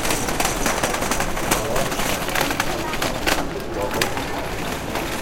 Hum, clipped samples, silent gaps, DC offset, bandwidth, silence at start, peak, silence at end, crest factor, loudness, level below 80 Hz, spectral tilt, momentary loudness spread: none; under 0.1%; none; under 0.1%; 17 kHz; 0 s; -2 dBFS; 0 s; 20 dB; -22 LUFS; -32 dBFS; -3 dB/octave; 6 LU